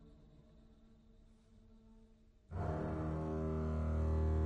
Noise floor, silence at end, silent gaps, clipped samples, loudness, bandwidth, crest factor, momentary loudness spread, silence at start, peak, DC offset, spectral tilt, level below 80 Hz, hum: -65 dBFS; 0 s; none; under 0.1%; -40 LUFS; 4.6 kHz; 14 dB; 6 LU; 0 s; -26 dBFS; under 0.1%; -10 dB/octave; -44 dBFS; none